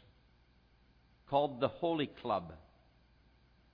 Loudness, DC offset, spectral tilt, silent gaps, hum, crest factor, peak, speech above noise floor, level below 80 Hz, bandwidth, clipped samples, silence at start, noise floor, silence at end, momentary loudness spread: -36 LUFS; under 0.1%; -4.5 dB/octave; none; none; 22 dB; -18 dBFS; 32 dB; -68 dBFS; 5.4 kHz; under 0.1%; 1.3 s; -67 dBFS; 1.15 s; 12 LU